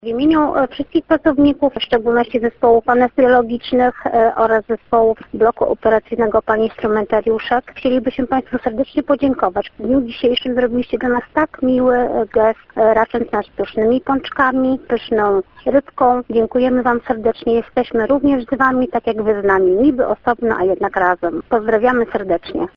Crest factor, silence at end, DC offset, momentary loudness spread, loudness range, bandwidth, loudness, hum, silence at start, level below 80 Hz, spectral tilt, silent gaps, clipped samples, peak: 14 dB; 0.1 s; under 0.1%; 5 LU; 3 LU; 5.6 kHz; -16 LUFS; none; 0.05 s; -44 dBFS; -8 dB/octave; none; under 0.1%; 0 dBFS